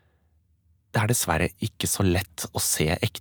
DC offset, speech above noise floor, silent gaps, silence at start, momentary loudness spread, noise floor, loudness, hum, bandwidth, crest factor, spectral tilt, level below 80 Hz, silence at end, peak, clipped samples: under 0.1%; 40 dB; none; 0.95 s; 6 LU; -65 dBFS; -25 LUFS; none; over 20 kHz; 20 dB; -4 dB/octave; -44 dBFS; 0 s; -6 dBFS; under 0.1%